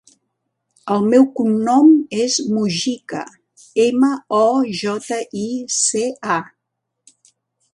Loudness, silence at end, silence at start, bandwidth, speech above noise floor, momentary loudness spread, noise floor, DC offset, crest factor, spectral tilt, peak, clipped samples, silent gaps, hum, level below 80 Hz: -17 LUFS; 1.3 s; 0.85 s; 11.5 kHz; 61 dB; 12 LU; -77 dBFS; under 0.1%; 18 dB; -4 dB/octave; -2 dBFS; under 0.1%; none; none; -66 dBFS